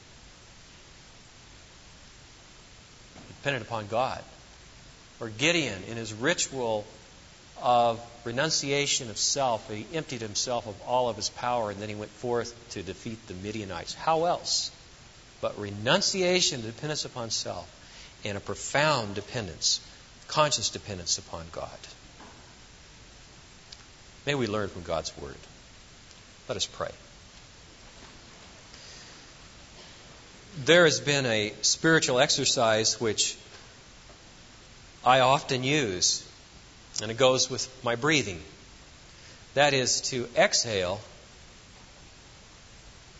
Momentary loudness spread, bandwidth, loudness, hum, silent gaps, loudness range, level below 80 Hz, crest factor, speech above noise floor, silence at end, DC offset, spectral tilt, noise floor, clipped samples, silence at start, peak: 25 LU; 8.2 kHz; -27 LUFS; none; none; 12 LU; -58 dBFS; 24 dB; 24 dB; 0 s; under 0.1%; -2.5 dB/octave; -51 dBFS; under 0.1%; 0.1 s; -6 dBFS